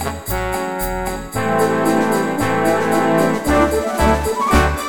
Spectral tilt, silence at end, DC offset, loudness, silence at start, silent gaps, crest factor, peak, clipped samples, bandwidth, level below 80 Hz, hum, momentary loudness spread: -5.5 dB/octave; 0 s; 1%; -17 LUFS; 0 s; none; 16 dB; 0 dBFS; under 0.1%; over 20 kHz; -28 dBFS; none; 7 LU